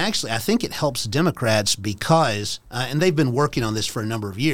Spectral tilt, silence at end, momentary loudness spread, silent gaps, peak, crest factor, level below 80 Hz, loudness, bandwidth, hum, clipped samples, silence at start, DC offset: -4.5 dB/octave; 0 s; 7 LU; none; -4 dBFS; 18 dB; -48 dBFS; -22 LUFS; 17.5 kHz; none; under 0.1%; 0 s; 0.9%